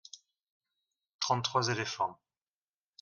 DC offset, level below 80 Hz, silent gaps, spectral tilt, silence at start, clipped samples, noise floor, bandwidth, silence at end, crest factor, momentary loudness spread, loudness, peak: under 0.1%; -78 dBFS; 0.50-0.60 s, 1.14-1.19 s; -3.5 dB/octave; 0.15 s; under 0.1%; under -90 dBFS; 10.5 kHz; 0.85 s; 22 dB; 18 LU; -32 LUFS; -14 dBFS